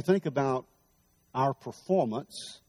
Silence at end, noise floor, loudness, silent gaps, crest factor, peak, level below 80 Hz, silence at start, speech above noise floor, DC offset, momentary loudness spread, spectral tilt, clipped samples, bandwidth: 0.1 s; -68 dBFS; -30 LUFS; none; 18 dB; -12 dBFS; -72 dBFS; 0 s; 39 dB; under 0.1%; 11 LU; -6.5 dB/octave; under 0.1%; 14 kHz